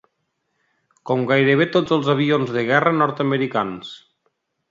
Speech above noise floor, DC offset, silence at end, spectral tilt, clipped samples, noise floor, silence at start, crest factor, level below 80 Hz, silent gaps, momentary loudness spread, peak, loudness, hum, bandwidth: 54 dB; under 0.1%; 0.75 s; -7 dB/octave; under 0.1%; -73 dBFS; 1.05 s; 20 dB; -64 dBFS; none; 8 LU; 0 dBFS; -19 LUFS; none; 7.6 kHz